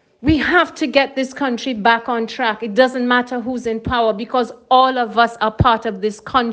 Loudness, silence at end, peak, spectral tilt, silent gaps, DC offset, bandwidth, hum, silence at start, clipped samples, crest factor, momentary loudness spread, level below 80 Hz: -17 LUFS; 0 s; 0 dBFS; -5.5 dB/octave; none; under 0.1%; 9.2 kHz; none; 0.2 s; under 0.1%; 16 dB; 8 LU; -40 dBFS